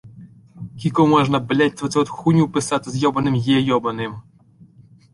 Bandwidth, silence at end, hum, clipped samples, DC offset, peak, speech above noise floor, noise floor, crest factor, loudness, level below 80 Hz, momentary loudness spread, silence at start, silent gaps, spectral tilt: 11.5 kHz; 0.9 s; none; under 0.1%; under 0.1%; -2 dBFS; 31 dB; -50 dBFS; 18 dB; -19 LUFS; -52 dBFS; 13 LU; 0.05 s; none; -6 dB/octave